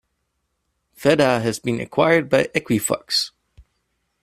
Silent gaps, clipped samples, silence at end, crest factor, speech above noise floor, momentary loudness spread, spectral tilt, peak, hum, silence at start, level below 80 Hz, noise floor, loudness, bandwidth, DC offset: none; under 0.1%; 0.6 s; 20 dB; 54 dB; 7 LU; -4 dB/octave; -2 dBFS; none; 1 s; -56 dBFS; -73 dBFS; -20 LUFS; 15.5 kHz; under 0.1%